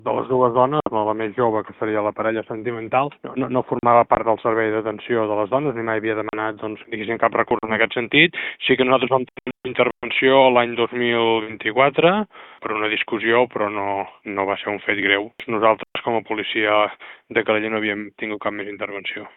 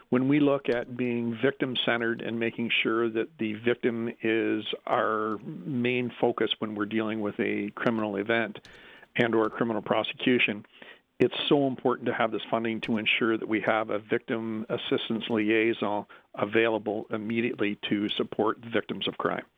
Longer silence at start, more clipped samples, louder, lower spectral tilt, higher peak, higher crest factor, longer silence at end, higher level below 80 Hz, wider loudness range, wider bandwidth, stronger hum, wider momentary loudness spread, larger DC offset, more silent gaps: about the same, 0.05 s vs 0.1 s; neither; first, -20 LUFS vs -28 LUFS; first, -9 dB/octave vs -7.5 dB/octave; first, 0 dBFS vs -8 dBFS; about the same, 20 dB vs 20 dB; about the same, 0.1 s vs 0.15 s; first, -58 dBFS vs -70 dBFS; about the same, 4 LU vs 2 LU; second, 4.1 kHz vs 5.2 kHz; neither; first, 11 LU vs 7 LU; neither; neither